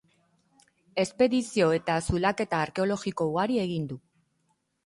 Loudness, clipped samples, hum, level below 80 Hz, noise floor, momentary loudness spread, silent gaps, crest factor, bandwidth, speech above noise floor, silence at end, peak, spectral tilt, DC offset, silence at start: -27 LUFS; under 0.1%; none; -50 dBFS; -74 dBFS; 9 LU; none; 18 dB; 11.5 kHz; 47 dB; 0.85 s; -10 dBFS; -5.5 dB/octave; under 0.1%; 0.95 s